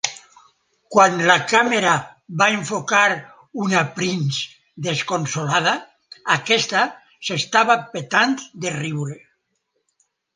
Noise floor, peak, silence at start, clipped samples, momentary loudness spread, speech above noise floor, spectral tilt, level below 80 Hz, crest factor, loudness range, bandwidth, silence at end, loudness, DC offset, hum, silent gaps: -73 dBFS; 0 dBFS; 0.05 s; under 0.1%; 12 LU; 53 dB; -3.5 dB/octave; -66 dBFS; 20 dB; 4 LU; 10.5 kHz; 1.2 s; -19 LUFS; under 0.1%; none; none